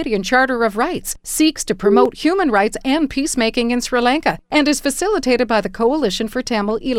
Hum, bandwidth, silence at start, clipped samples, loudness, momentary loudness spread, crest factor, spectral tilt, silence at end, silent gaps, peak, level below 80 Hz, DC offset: none; 16.5 kHz; 0 s; under 0.1%; -17 LUFS; 5 LU; 16 dB; -3.5 dB/octave; 0 s; none; 0 dBFS; -40 dBFS; under 0.1%